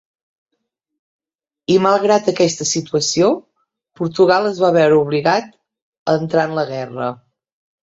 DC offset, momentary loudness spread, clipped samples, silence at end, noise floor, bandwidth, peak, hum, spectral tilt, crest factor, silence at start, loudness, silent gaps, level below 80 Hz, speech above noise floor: under 0.1%; 11 LU; under 0.1%; 0.7 s; -75 dBFS; 8 kHz; -2 dBFS; none; -4.5 dB/octave; 16 dB; 1.7 s; -16 LUFS; 5.82-5.92 s, 5.98-6.06 s; -60 dBFS; 60 dB